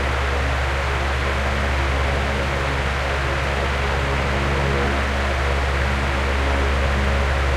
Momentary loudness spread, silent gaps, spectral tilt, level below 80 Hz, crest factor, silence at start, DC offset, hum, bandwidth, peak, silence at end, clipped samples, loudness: 2 LU; none; -5.5 dB/octave; -24 dBFS; 14 dB; 0 s; under 0.1%; none; 12 kHz; -6 dBFS; 0 s; under 0.1%; -21 LUFS